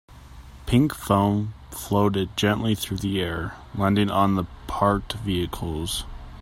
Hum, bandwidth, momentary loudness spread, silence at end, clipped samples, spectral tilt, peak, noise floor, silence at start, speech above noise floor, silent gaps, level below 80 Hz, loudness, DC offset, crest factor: none; 16 kHz; 11 LU; 0 s; under 0.1%; -6 dB/octave; -4 dBFS; -43 dBFS; 0.1 s; 20 dB; none; -42 dBFS; -24 LUFS; under 0.1%; 20 dB